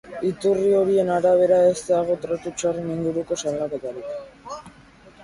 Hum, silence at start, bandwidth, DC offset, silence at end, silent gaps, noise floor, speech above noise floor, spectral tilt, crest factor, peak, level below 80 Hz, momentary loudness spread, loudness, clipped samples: none; 0.05 s; 11.5 kHz; under 0.1%; 0 s; none; -49 dBFS; 28 dB; -5.5 dB/octave; 16 dB; -6 dBFS; -56 dBFS; 18 LU; -21 LUFS; under 0.1%